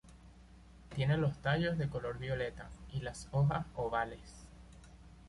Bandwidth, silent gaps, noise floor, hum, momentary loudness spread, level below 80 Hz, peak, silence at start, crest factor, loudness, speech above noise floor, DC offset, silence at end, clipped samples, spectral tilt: 11.5 kHz; none; -57 dBFS; none; 22 LU; -54 dBFS; -20 dBFS; 0.05 s; 16 dB; -36 LUFS; 22 dB; under 0.1%; 0 s; under 0.1%; -7 dB/octave